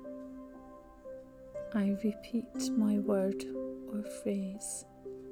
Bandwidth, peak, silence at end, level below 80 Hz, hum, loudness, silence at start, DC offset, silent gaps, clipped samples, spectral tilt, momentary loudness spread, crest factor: 15.5 kHz; -20 dBFS; 0 s; -64 dBFS; none; -35 LUFS; 0 s; under 0.1%; none; under 0.1%; -6 dB/octave; 19 LU; 16 dB